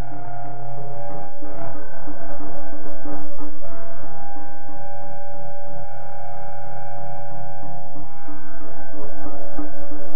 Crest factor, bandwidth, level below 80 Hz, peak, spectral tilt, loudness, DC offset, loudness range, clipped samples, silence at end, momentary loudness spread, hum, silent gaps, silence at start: 10 dB; 3.2 kHz; -44 dBFS; -4 dBFS; -11 dB/octave; -37 LUFS; 30%; 1 LU; under 0.1%; 0 s; 4 LU; none; none; 0 s